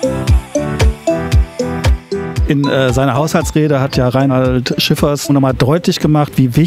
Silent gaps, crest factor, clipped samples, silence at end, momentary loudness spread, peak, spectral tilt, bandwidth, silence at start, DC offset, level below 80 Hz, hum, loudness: none; 12 dB; under 0.1%; 0 s; 4 LU; 0 dBFS; -6 dB/octave; 16 kHz; 0 s; under 0.1%; -20 dBFS; none; -14 LUFS